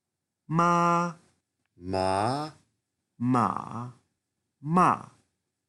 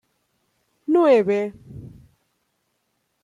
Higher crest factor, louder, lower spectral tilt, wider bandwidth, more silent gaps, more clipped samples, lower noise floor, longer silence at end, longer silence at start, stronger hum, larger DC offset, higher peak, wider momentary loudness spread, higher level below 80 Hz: about the same, 20 dB vs 18 dB; second, -26 LUFS vs -19 LUFS; about the same, -6.5 dB/octave vs -7.5 dB/octave; first, 11.5 kHz vs 10 kHz; neither; neither; first, -82 dBFS vs -72 dBFS; second, 0.65 s vs 1.35 s; second, 0.5 s vs 0.9 s; neither; neither; second, -10 dBFS vs -6 dBFS; second, 17 LU vs 25 LU; second, -70 dBFS vs -62 dBFS